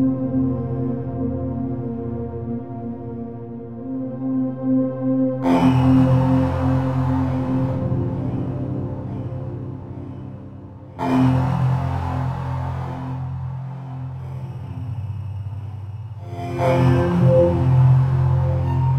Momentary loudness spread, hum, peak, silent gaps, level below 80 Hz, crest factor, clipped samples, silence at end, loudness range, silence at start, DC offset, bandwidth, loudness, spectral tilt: 16 LU; none; -4 dBFS; none; -40 dBFS; 16 dB; under 0.1%; 0 s; 10 LU; 0 s; under 0.1%; 6 kHz; -21 LUFS; -9.5 dB/octave